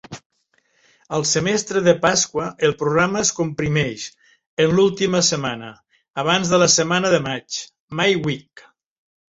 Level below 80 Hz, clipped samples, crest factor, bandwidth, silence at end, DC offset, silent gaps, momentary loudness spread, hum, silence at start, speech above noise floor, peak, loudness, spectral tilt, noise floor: -54 dBFS; under 0.1%; 18 dB; 8.2 kHz; 0.95 s; under 0.1%; 0.26-0.30 s, 4.47-4.57 s, 7.80-7.88 s; 15 LU; none; 0.1 s; 45 dB; -2 dBFS; -19 LUFS; -3.5 dB/octave; -64 dBFS